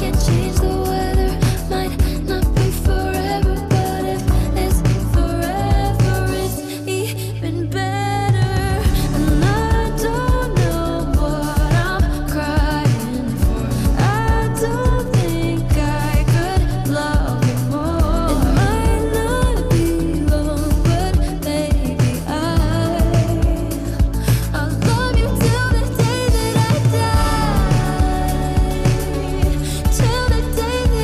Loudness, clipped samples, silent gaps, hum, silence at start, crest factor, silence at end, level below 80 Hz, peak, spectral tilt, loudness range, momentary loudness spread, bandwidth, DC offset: -18 LUFS; under 0.1%; none; none; 0 s; 10 dB; 0 s; -22 dBFS; -6 dBFS; -6 dB/octave; 2 LU; 4 LU; 14.5 kHz; under 0.1%